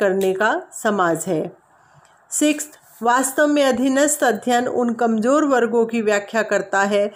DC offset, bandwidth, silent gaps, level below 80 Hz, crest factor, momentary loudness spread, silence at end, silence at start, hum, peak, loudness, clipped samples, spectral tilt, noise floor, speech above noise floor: under 0.1%; 16 kHz; none; -66 dBFS; 14 dB; 7 LU; 0.05 s; 0 s; none; -4 dBFS; -19 LUFS; under 0.1%; -3.5 dB/octave; -53 dBFS; 34 dB